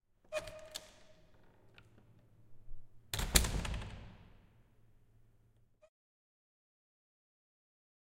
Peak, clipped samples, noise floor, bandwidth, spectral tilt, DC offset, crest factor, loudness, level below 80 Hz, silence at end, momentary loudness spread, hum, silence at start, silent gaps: -6 dBFS; under 0.1%; -69 dBFS; 16 kHz; -2.5 dB/octave; under 0.1%; 38 dB; -37 LUFS; -48 dBFS; 3.7 s; 23 LU; none; 0.3 s; none